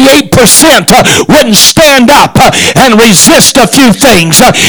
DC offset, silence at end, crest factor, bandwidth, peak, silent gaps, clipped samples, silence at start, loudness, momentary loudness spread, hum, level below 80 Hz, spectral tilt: under 0.1%; 0 s; 2 dB; over 20 kHz; 0 dBFS; none; 50%; 0 s; -2 LUFS; 3 LU; none; -28 dBFS; -3 dB/octave